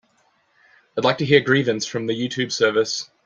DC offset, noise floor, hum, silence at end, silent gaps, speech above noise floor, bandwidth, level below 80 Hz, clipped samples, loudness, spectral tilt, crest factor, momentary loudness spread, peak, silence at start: under 0.1%; -63 dBFS; none; 0.2 s; none; 43 dB; 9.2 kHz; -62 dBFS; under 0.1%; -20 LUFS; -4.5 dB/octave; 20 dB; 9 LU; -2 dBFS; 0.95 s